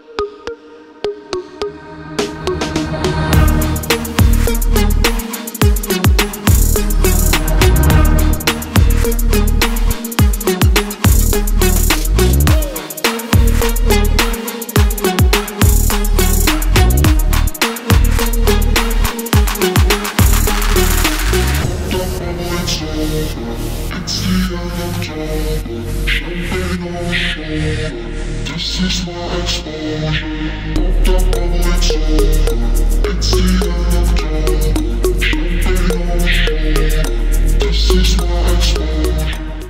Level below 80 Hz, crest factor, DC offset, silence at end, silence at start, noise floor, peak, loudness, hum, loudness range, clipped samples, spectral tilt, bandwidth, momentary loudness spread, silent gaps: -16 dBFS; 14 dB; under 0.1%; 0 s; 0.1 s; -38 dBFS; 0 dBFS; -15 LUFS; none; 6 LU; under 0.1%; -4.5 dB/octave; 16.5 kHz; 9 LU; none